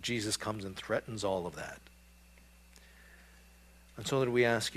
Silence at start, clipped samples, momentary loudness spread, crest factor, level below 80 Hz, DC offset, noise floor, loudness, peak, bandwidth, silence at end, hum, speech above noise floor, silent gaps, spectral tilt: 0 s; under 0.1%; 17 LU; 22 dB; -60 dBFS; under 0.1%; -59 dBFS; -34 LUFS; -16 dBFS; 14.5 kHz; 0 s; none; 25 dB; none; -4 dB/octave